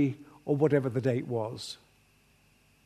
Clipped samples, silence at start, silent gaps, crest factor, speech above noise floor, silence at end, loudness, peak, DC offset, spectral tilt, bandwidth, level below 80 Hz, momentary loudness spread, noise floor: under 0.1%; 0 s; none; 20 dB; 36 dB; 1.1 s; -30 LUFS; -12 dBFS; under 0.1%; -7.5 dB/octave; 13.5 kHz; -70 dBFS; 16 LU; -65 dBFS